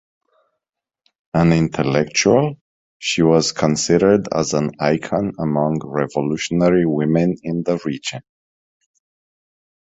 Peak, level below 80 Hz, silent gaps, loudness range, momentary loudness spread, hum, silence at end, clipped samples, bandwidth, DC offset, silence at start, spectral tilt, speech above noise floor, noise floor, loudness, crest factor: -2 dBFS; -48 dBFS; 2.61-3.00 s; 4 LU; 8 LU; none; 1.8 s; under 0.1%; 8.2 kHz; under 0.1%; 1.35 s; -5.5 dB/octave; 66 dB; -84 dBFS; -18 LUFS; 18 dB